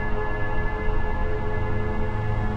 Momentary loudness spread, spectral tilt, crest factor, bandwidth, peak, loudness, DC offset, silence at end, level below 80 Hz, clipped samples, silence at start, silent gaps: 1 LU; -8.5 dB/octave; 12 dB; 4.9 kHz; -10 dBFS; -28 LUFS; under 0.1%; 0 s; -26 dBFS; under 0.1%; 0 s; none